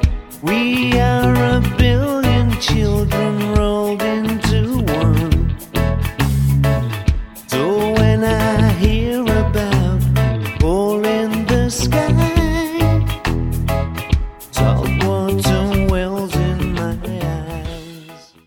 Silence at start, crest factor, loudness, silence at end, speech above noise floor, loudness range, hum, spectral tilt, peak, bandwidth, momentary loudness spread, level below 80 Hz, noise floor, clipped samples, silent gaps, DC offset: 0 s; 16 dB; -17 LUFS; 0.25 s; 25 dB; 2 LU; none; -6.5 dB/octave; 0 dBFS; 18 kHz; 7 LU; -24 dBFS; -40 dBFS; under 0.1%; none; under 0.1%